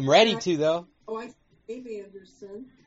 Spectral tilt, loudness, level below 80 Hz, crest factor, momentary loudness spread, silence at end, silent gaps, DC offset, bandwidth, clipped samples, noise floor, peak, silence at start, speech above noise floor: -3 dB/octave; -24 LUFS; -66 dBFS; 20 dB; 25 LU; 0.2 s; none; under 0.1%; 8 kHz; under 0.1%; -44 dBFS; -6 dBFS; 0 s; 19 dB